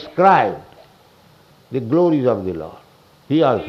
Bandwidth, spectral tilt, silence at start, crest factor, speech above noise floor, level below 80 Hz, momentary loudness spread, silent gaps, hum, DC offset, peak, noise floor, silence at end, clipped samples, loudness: 7 kHz; -8.5 dB/octave; 0 s; 18 dB; 34 dB; -56 dBFS; 17 LU; none; none; under 0.1%; 0 dBFS; -50 dBFS; 0 s; under 0.1%; -17 LUFS